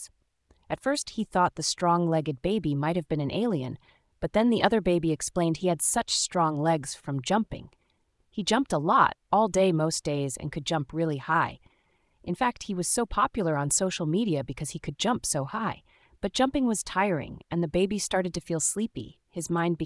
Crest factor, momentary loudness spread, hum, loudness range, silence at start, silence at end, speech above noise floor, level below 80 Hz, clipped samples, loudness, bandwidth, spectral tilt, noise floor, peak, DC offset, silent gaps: 22 dB; 11 LU; none; 3 LU; 0 s; 0 s; 43 dB; -52 dBFS; under 0.1%; -27 LUFS; 12 kHz; -4.5 dB/octave; -70 dBFS; -6 dBFS; under 0.1%; none